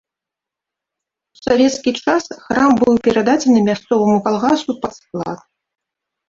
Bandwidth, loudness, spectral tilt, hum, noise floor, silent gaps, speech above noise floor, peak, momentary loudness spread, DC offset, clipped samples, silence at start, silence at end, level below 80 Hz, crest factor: 7.8 kHz; -16 LUFS; -5 dB/octave; none; -85 dBFS; none; 70 dB; -2 dBFS; 13 LU; under 0.1%; under 0.1%; 1.45 s; 0.9 s; -52 dBFS; 16 dB